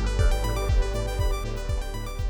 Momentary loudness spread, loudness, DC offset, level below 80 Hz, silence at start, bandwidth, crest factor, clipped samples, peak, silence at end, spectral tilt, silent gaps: 6 LU; -28 LUFS; under 0.1%; -26 dBFS; 0 s; 18.5 kHz; 14 dB; under 0.1%; -10 dBFS; 0 s; -5.5 dB/octave; none